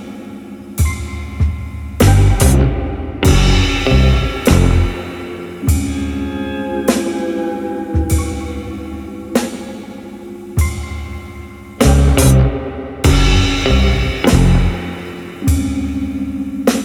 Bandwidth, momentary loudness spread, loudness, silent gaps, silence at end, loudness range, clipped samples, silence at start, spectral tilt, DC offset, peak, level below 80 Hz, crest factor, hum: 19 kHz; 16 LU; -15 LUFS; none; 0 s; 8 LU; under 0.1%; 0 s; -5.5 dB/octave; under 0.1%; 0 dBFS; -18 dBFS; 14 dB; none